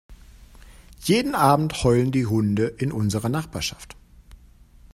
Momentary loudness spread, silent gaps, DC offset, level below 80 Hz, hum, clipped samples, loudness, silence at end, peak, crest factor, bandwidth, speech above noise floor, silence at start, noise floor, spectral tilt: 11 LU; none; under 0.1%; -44 dBFS; none; under 0.1%; -22 LUFS; 0.6 s; -2 dBFS; 22 dB; 16 kHz; 28 dB; 0.1 s; -50 dBFS; -6 dB/octave